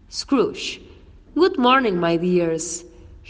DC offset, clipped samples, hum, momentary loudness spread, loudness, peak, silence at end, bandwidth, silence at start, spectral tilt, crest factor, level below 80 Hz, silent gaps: under 0.1%; under 0.1%; none; 13 LU; -20 LUFS; -4 dBFS; 0.15 s; 9.8 kHz; 0.1 s; -4.5 dB/octave; 18 dB; -50 dBFS; none